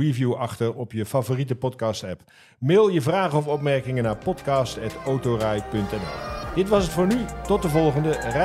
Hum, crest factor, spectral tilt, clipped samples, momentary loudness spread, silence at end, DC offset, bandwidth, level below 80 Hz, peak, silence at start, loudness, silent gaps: none; 16 dB; -6.5 dB/octave; under 0.1%; 9 LU; 0 s; under 0.1%; 15.5 kHz; -42 dBFS; -8 dBFS; 0 s; -24 LUFS; none